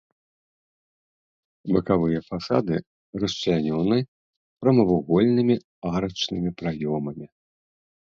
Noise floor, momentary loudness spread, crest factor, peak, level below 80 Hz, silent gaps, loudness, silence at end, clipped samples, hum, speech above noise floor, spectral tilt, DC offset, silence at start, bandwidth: under -90 dBFS; 10 LU; 18 dB; -6 dBFS; -52 dBFS; 2.87-3.13 s, 4.08-4.57 s, 5.64-5.82 s; -24 LUFS; 0.85 s; under 0.1%; none; over 67 dB; -7 dB/octave; under 0.1%; 1.65 s; 7.4 kHz